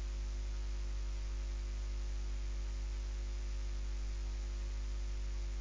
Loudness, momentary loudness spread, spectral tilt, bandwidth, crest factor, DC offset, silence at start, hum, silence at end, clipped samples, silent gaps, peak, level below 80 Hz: -43 LUFS; 0 LU; -5 dB/octave; 7.6 kHz; 6 dB; under 0.1%; 0 s; 50 Hz at -40 dBFS; 0 s; under 0.1%; none; -32 dBFS; -38 dBFS